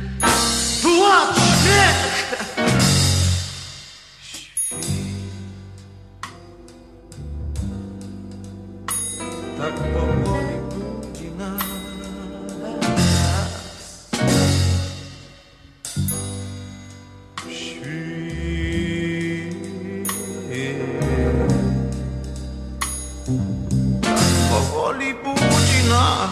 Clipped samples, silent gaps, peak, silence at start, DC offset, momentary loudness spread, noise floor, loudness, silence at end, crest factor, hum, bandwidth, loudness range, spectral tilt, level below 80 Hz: under 0.1%; none; 0 dBFS; 0 s; under 0.1%; 20 LU; -47 dBFS; -20 LUFS; 0 s; 20 dB; none; 14 kHz; 12 LU; -4 dB/octave; -34 dBFS